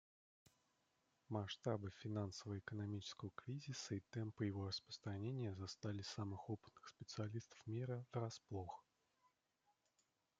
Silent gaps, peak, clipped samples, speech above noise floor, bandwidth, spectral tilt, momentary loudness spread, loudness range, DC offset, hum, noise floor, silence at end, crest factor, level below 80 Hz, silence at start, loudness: none; -28 dBFS; under 0.1%; 37 dB; 7.8 kHz; -6 dB/octave; 7 LU; 3 LU; under 0.1%; none; -86 dBFS; 1.6 s; 22 dB; -84 dBFS; 1.3 s; -49 LUFS